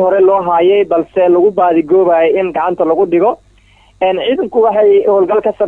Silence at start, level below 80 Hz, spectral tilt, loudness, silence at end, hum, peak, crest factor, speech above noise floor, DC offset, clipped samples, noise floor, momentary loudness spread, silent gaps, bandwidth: 0 s; -50 dBFS; -8 dB/octave; -11 LUFS; 0 s; none; -2 dBFS; 8 dB; 36 dB; under 0.1%; under 0.1%; -46 dBFS; 5 LU; none; 3.7 kHz